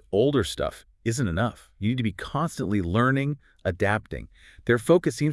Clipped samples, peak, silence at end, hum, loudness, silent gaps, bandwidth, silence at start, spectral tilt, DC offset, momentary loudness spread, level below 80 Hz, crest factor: under 0.1%; -8 dBFS; 0 s; none; -26 LUFS; none; 12 kHz; 0.1 s; -6 dB/octave; under 0.1%; 10 LU; -48 dBFS; 18 dB